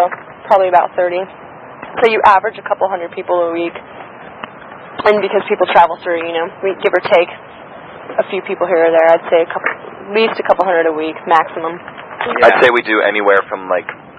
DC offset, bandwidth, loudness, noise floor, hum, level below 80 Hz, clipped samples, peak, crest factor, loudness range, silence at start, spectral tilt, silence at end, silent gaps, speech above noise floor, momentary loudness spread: under 0.1%; 7.8 kHz; -14 LUFS; -33 dBFS; none; -56 dBFS; 0.2%; 0 dBFS; 14 dB; 3 LU; 0 s; -5.5 dB/octave; 0.05 s; none; 20 dB; 20 LU